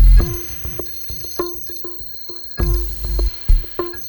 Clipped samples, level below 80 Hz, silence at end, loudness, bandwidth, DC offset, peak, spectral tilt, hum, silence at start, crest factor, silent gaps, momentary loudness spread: under 0.1%; -18 dBFS; 0 s; -22 LUFS; over 20 kHz; under 0.1%; -2 dBFS; -5.5 dB/octave; none; 0 s; 16 dB; none; 7 LU